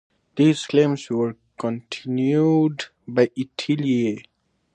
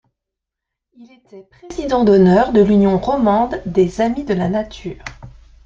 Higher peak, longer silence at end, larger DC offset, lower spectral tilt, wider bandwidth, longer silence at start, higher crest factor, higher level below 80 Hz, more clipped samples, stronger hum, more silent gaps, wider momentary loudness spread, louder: about the same, -4 dBFS vs -2 dBFS; first, 0.55 s vs 0.35 s; neither; second, -6.5 dB/octave vs -8 dB/octave; first, 9.4 kHz vs 7.6 kHz; second, 0.35 s vs 1 s; about the same, 18 dB vs 14 dB; second, -68 dBFS vs -40 dBFS; neither; neither; neither; second, 12 LU vs 18 LU; second, -22 LUFS vs -15 LUFS